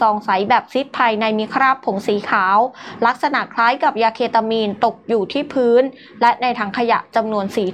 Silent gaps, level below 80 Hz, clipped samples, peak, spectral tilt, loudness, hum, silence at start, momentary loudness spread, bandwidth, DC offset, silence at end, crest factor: none; -66 dBFS; under 0.1%; -2 dBFS; -5.5 dB/octave; -17 LUFS; none; 0 s; 5 LU; 13 kHz; under 0.1%; 0 s; 14 dB